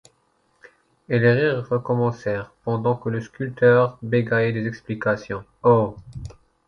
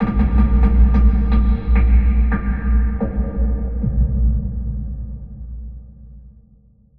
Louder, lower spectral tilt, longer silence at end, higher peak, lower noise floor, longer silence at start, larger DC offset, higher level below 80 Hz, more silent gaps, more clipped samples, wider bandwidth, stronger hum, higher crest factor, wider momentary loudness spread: second, -22 LUFS vs -18 LUFS; second, -8.5 dB/octave vs -11.5 dB/octave; first, 0.35 s vs 0 s; about the same, -4 dBFS vs -2 dBFS; first, -65 dBFS vs -51 dBFS; first, 1.1 s vs 0 s; second, under 0.1% vs 1%; second, -52 dBFS vs -18 dBFS; neither; neither; first, 7.2 kHz vs 2.9 kHz; neither; about the same, 18 dB vs 14 dB; second, 13 LU vs 19 LU